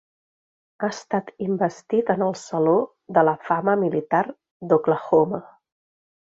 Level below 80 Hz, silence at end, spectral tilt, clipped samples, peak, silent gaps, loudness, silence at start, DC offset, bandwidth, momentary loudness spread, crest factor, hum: -66 dBFS; 0.85 s; -7 dB/octave; under 0.1%; -4 dBFS; 4.51-4.60 s; -22 LUFS; 0.8 s; under 0.1%; 7.8 kHz; 9 LU; 18 dB; none